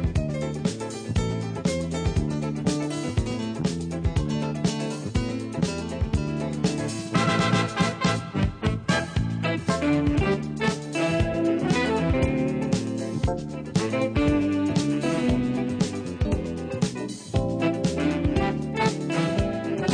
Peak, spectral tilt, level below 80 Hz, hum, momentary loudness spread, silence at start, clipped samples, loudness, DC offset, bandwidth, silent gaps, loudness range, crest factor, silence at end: -8 dBFS; -6 dB/octave; -36 dBFS; none; 5 LU; 0 s; under 0.1%; -26 LUFS; under 0.1%; 10 kHz; none; 3 LU; 16 dB; 0 s